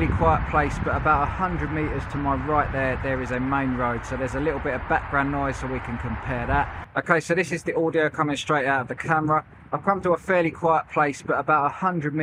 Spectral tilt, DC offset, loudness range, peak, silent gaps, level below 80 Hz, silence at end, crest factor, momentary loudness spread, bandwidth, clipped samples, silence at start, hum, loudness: -6.5 dB/octave; under 0.1%; 3 LU; -4 dBFS; none; -38 dBFS; 0 s; 20 dB; 6 LU; 12 kHz; under 0.1%; 0 s; none; -24 LUFS